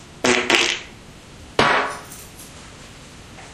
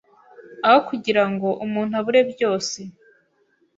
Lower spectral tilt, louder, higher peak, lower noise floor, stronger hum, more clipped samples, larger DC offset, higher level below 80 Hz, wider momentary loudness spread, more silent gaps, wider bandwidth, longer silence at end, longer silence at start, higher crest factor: second, -2 dB/octave vs -4.5 dB/octave; about the same, -19 LUFS vs -20 LUFS; about the same, 0 dBFS vs -2 dBFS; second, -42 dBFS vs -64 dBFS; neither; neither; neither; first, -48 dBFS vs -68 dBFS; first, 24 LU vs 10 LU; neither; first, 15.5 kHz vs 8 kHz; second, 0 s vs 0.85 s; second, 0 s vs 0.4 s; about the same, 24 dB vs 20 dB